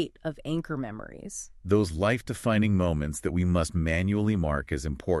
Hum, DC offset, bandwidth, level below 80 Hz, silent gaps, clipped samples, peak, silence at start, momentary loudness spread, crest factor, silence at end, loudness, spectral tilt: none; under 0.1%; 12.5 kHz; -40 dBFS; none; under 0.1%; -12 dBFS; 0 s; 13 LU; 16 dB; 0 s; -28 LUFS; -6.5 dB/octave